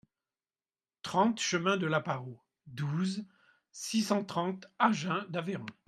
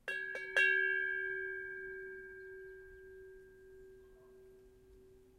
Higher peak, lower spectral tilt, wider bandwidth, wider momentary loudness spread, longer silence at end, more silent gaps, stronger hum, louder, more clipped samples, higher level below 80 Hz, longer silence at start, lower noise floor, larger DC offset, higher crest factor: first, -10 dBFS vs -20 dBFS; first, -5 dB/octave vs -2.5 dB/octave; about the same, 14 kHz vs 14 kHz; second, 15 LU vs 27 LU; about the same, 0.15 s vs 0.2 s; neither; neither; first, -32 LUFS vs -35 LUFS; neither; second, -76 dBFS vs -70 dBFS; first, 1.05 s vs 0.05 s; first, under -90 dBFS vs -61 dBFS; neither; about the same, 22 dB vs 22 dB